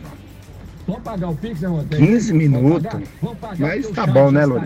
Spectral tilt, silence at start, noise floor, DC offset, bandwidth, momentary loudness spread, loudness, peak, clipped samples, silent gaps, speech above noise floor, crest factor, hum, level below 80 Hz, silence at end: -8 dB/octave; 0 s; -38 dBFS; under 0.1%; 8.4 kHz; 14 LU; -18 LUFS; -2 dBFS; under 0.1%; none; 21 dB; 16 dB; none; -42 dBFS; 0 s